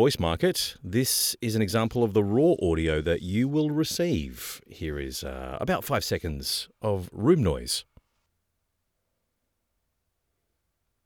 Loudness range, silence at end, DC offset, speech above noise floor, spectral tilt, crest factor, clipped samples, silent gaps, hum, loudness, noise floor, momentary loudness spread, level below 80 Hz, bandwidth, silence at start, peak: 6 LU; 3.25 s; under 0.1%; 52 dB; -5 dB/octave; 18 dB; under 0.1%; none; none; -26 LUFS; -79 dBFS; 11 LU; -46 dBFS; over 20 kHz; 0 s; -10 dBFS